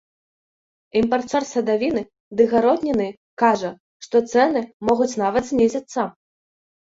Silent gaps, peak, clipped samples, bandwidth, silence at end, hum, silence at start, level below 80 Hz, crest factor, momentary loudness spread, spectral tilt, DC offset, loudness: 2.20-2.31 s, 3.17-3.37 s, 3.80-4.00 s, 4.74-4.80 s; -4 dBFS; under 0.1%; 8 kHz; 0.85 s; none; 0.95 s; -56 dBFS; 18 dB; 9 LU; -5 dB/octave; under 0.1%; -21 LUFS